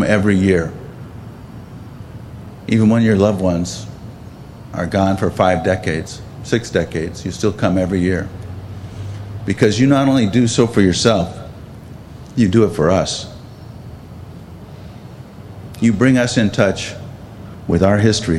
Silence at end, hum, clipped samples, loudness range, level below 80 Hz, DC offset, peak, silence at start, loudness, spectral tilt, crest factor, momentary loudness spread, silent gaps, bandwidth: 0 s; none; under 0.1%; 5 LU; -42 dBFS; under 0.1%; 0 dBFS; 0 s; -16 LUFS; -6 dB/octave; 18 dB; 22 LU; none; 13 kHz